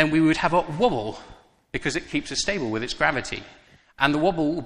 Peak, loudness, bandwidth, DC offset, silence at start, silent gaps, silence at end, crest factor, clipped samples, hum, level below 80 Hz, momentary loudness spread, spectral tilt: -2 dBFS; -24 LUFS; 10.5 kHz; under 0.1%; 0 s; none; 0 s; 22 dB; under 0.1%; none; -46 dBFS; 14 LU; -4.5 dB/octave